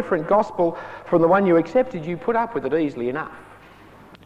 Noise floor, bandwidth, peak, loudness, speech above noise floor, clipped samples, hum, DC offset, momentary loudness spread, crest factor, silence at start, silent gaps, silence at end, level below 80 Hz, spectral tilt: -46 dBFS; 8 kHz; -6 dBFS; -21 LUFS; 26 dB; under 0.1%; none; under 0.1%; 10 LU; 16 dB; 0 s; none; 0.1 s; -56 dBFS; -8.5 dB/octave